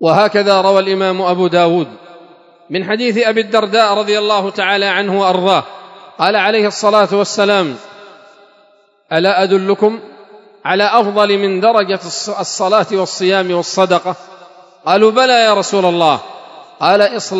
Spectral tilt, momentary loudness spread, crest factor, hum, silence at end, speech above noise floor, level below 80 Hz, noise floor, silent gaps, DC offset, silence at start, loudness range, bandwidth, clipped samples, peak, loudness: -4 dB/octave; 8 LU; 14 dB; none; 0 s; 39 dB; -70 dBFS; -51 dBFS; none; under 0.1%; 0 s; 2 LU; 11 kHz; 0.2%; 0 dBFS; -13 LUFS